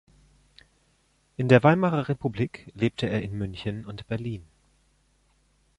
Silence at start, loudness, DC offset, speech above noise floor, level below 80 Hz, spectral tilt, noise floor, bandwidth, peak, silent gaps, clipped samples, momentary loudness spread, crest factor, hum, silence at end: 1.4 s; -26 LUFS; under 0.1%; 42 dB; -54 dBFS; -8 dB/octave; -66 dBFS; 10.5 kHz; -4 dBFS; none; under 0.1%; 17 LU; 24 dB; none; 1.35 s